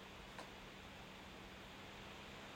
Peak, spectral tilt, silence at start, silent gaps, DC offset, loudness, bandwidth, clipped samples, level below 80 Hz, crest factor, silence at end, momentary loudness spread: -38 dBFS; -4 dB/octave; 0 s; none; under 0.1%; -54 LUFS; 16 kHz; under 0.1%; -66 dBFS; 18 dB; 0 s; 1 LU